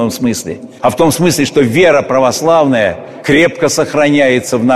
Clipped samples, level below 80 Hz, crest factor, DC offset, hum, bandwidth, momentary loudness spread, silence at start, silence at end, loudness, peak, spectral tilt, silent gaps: under 0.1%; -46 dBFS; 10 dB; under 0.1%; none; 14 kHz; 7 LU; 0 s; 0 s; -11 LUFS; 0 dBFS; -4.5 dB/octave; none